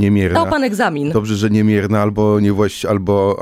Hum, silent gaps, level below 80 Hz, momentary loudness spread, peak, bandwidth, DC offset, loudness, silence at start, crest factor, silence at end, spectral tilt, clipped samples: none; none; -42 dBFS; 4 LU; -2 dBFS; 15 kHz; under 0.1%; -15 LUFS; 0 s; 14 dB; 0 s; -7 dB/octave; under 0.1%